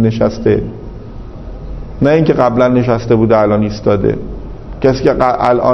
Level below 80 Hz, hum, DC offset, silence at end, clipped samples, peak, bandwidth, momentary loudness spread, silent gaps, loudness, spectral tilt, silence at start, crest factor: -30 dBFS; none; under 0.1%; 0 s; 0.1%; 0 dBFS; 6.4 kHz; 19 LU; none; -12 LUFS; -8 dB/octave; 0 s; 12 dB